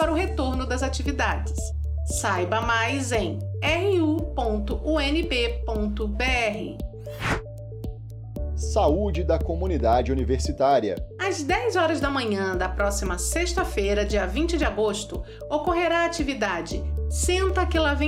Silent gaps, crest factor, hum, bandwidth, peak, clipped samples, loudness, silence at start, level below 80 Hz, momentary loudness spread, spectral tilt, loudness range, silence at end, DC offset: none; 16 dB; none; 15 kHz; -8 dBFS; under 0.1%; -25 LUFS; 0 s; -32 dBFS; 8 LU; -5 dB/octave; 3 LU; 0 s; under 0.1%